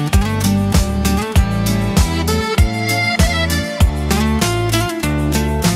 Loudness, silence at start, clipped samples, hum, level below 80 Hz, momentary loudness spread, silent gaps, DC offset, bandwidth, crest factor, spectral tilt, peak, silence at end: -16 LUFS; 0 s; under 0.1%; none; -20 dBFS; 2 LU; none; under 0.1%; 16.5 kHz; 14 dB; -5 dB/octave; 0 dBFS; 0 s